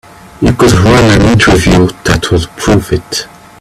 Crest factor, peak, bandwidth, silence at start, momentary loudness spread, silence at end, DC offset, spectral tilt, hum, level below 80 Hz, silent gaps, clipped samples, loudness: 8 dB; 0 dBFS; 14.5 kHz; 0.4 s; 9 LU; 0.35 s; under 0.1%; -5.5 dB/octave; none; -24 dBFS; none; 0.1%; -8 LUFS